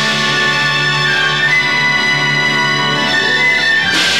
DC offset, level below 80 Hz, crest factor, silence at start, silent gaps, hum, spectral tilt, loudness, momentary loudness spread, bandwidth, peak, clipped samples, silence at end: 1%; -48 dBFS; 8 dB; 0 s; none; none; -2.5 dB/octave; -11 LUFS; 2 LU; 18 kHz; -4 dBFS; under 0.1%; 0 s